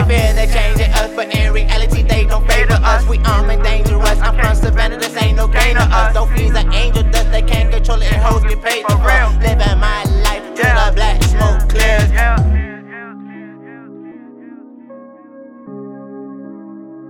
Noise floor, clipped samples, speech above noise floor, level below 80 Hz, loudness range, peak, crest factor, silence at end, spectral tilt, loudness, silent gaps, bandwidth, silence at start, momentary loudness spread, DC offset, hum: -37 dBFS; under 0.1%; 26 dB; -14 dBFS; 18 LU; 0 dBFS; 12 dB; 0 s; -5 dB/octave; -14 LUFS; none; 17 kHz; 0 s; 19 LU; under 0.1%; none